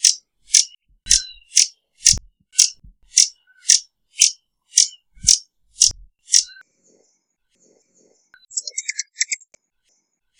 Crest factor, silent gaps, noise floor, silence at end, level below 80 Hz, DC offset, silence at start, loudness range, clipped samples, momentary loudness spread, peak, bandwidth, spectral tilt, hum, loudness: 22 dB; none; -69 dBFS; 1.05 s; -46 dBFS; under 0.1%; 0 s; 13 LU; under 0.1%; 12 LU; 0 dBFS; over 20 kHz; 3 dB/octave; none; -17 LUFS